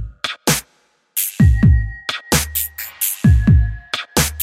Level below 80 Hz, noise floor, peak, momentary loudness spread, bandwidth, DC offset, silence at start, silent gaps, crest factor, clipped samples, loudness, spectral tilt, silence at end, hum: -22 dBFS; -60 dBFS; -2 dBFS; 11 LU; 16.5 kHz; under 0.1%; 0 s; none; 14 dB; under 0.1%; -17 LUFS; -4.5 dB/octave; 0 s; none